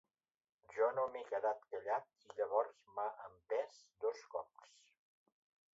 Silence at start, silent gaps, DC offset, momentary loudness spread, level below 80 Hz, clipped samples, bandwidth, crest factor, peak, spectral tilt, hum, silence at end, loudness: 0.7 s; none; under 0.1%; 13 LU; -88 dBFS; under 0.1%; 7.6 kHz; 22 dB; -22 dBFS; -2 dB/octave; none; 1.3 s; -41 LUFS